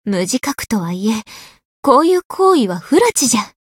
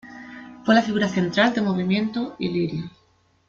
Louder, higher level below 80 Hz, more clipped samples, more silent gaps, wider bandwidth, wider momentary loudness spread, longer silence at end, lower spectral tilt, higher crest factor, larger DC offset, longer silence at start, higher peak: first, -15 LUFS vs -22 LUFS; first, -52 dBFS vs -60 dBFS; neither; first, 1.65-1.83 s, 2.25-2.30 s vs none; first, 17.5 kHz vs 7.6 kHz; second, 8 LU vs 20 LU; second, 0.2 s vs 0.6 s; second, -4 dB/octave vs -6 dB/octave; about the same, 16 dB vs 20 dB; neither; about the same, 0.05 s vs 0.05 s; first, 0 dBFS vs -4 dBFS